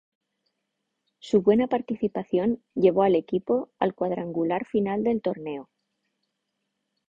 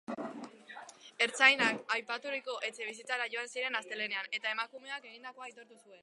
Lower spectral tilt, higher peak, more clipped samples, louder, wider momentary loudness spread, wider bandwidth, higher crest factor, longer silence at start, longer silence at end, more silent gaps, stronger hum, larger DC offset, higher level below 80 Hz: first, -8 dB/octave vs -1.5 dB/octave; about the same, -8 dBFS vs -8 dBFS; neither; first, -25 LUFS vs -33 LUFS; second, 8 LU vs 24 LU; second, 7.6 kHz vs 11.5 kHz; second, 18 dB vs 28 dB; first, 1.25 s vs 0.1 s; first, 1.45 s vs 0.05 s; neither; neither; neither; first, -64 dBFS vs under -90 dBFS